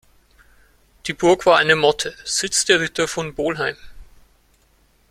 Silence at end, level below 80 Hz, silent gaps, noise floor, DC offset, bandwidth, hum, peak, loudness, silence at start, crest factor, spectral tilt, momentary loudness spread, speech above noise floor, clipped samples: 1.1 s; -50 dBFS; none; -58 dBFS; under 0.1%; 15.5 kHz; none; -2 dBFS; -18 LUFS; 1.05 s; 20 dB; -2.5 dB/octave; 11 LU; 40 dB; under 0.1%